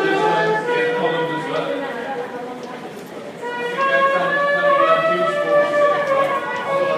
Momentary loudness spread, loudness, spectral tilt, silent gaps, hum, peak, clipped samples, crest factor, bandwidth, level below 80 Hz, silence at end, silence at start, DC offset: 15 LU; -18 LUFS; -5 dB/octave; none; none; -2 dBFS; under 0.1%; 16 dB; 14 kHz; -72 dBFS; 0 s; 0 s; under 0.1%